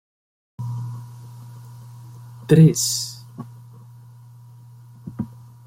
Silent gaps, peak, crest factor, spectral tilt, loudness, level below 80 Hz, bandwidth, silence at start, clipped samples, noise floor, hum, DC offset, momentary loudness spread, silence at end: none; -2 dBFS; 22 dB; -5.5 dB/octave; -20 LUFS; -58 dBFS; 16 kHz; 0.6 s; under 0.1%; -44 dBFS; none; under 0.1%; 27 LU; 0.35 s